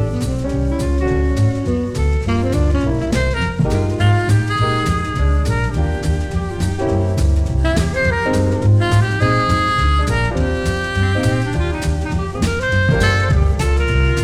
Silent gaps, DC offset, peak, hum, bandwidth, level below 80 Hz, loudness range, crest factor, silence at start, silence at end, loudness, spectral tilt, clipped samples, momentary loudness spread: none; under 0.1%; -2 dBFS; none; 12.5 kHz; -22 dBFS; 2 LU; 14 dB; 0 s; 0 s; -17 LUFS; -6.5 dB/octave; under 0.1%; 5 LU